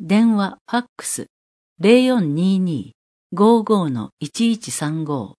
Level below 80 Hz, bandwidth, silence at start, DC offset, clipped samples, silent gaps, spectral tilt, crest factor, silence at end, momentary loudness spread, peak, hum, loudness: -68 dBFS; 11 kHz; 0 s; under 0.1%; under 0.1%; 0.61-0.65 s, 0.89-0.96 s, 1.30-1.76 s, 2.95-3.30 s, 4.12-4.17 s; -5.5 dB/octave; 18 dB; 0.1 s; 12 LU; 0 dBFS; none; -19 LUFS